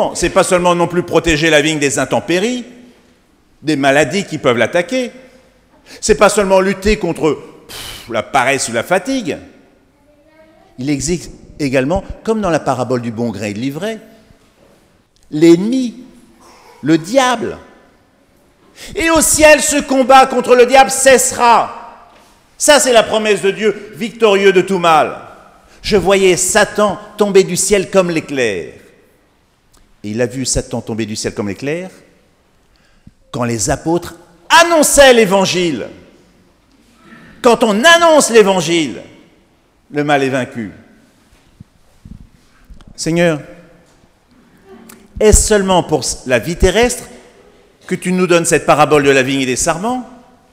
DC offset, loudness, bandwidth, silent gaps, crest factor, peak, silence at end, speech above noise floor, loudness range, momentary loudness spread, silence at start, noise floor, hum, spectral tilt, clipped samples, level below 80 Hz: under 0.1%; -12 LUFS; 16.5 kHz; none; 14 dB; 0 dBFS; 0.4 s; 42 dB; 11 LU; 16 LU; 0 s; -54 dBFS; none; -3.5 dB/octave; 0.3%; -34 dBFS